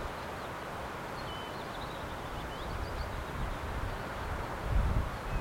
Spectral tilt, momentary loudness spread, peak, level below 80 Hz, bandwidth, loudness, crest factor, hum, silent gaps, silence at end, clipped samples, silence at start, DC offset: -5.5 dB/octave; 6 LU; -18 dBFS; -40 dBFS; 16.5 kHz; -38 LUFS; 18 dB; none; none; 0 s; under 0.1%; 0 s; under 0.1%